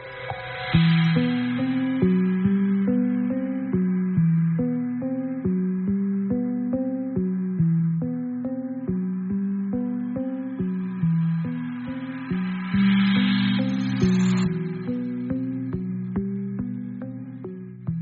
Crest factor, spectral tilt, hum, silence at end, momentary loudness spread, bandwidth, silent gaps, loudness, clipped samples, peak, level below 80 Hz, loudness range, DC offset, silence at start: 18 dB; -7 dB/octave; none; 0 s; 10 LU; 4.9 kHz; none; -24 LUFS; under 0.1%; -6 dBFS; -52 dBFS; 5 LU; under 0.1%; 0 s